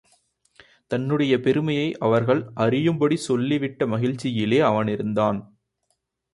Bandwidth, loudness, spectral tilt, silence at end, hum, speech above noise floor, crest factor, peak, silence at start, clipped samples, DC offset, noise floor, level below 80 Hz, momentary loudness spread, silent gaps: 11.5 kHz; -22 LUFS; -7 dB/octave; 0.9 s; none; 52 dB; 18 dB; -6 dBFS; 0.9 s; under 0.1%; under 0.1%; -74 dBFS; -60 dBFS; 5 LU; none